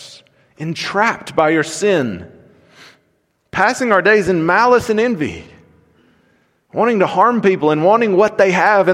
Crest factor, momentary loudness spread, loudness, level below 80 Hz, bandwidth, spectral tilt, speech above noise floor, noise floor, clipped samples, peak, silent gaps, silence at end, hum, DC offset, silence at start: 16 dB; 12 LU; -14 LUFS; -52 dBFS; 14.5 kHz; -5 dB/octave; 49 dB; -63 dBFS; under 0.1%; 0 dBFS; none; 0 s; none; under 0.1%; 0 s